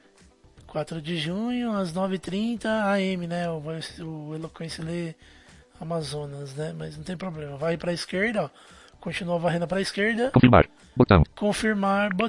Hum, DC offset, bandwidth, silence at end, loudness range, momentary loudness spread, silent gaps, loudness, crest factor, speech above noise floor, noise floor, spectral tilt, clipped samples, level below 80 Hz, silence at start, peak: none; under 0.1%; 11.5 kHz; 0 s; 12 LU; 16 LU; none; -26 LUFS; 24 dB; 31 dB; -56 dBFS; -6.5 dB/octave; under 0.1%; -44 dBFS; 0.65 s; -2 dBFS